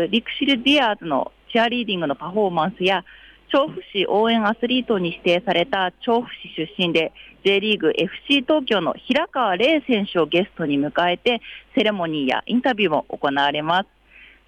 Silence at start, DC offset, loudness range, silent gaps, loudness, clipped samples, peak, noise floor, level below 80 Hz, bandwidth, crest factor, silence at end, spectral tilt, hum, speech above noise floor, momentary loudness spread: 0 s; under 0.1%; 2 LU; none; -20 LUFS; under 0.1%; -8 dBFS; -49 dBFS; -58 dBFS; 9.8 kHz; 14 dB; 0.25 s; -6 dB/octave; none; 28 dB; 6 LU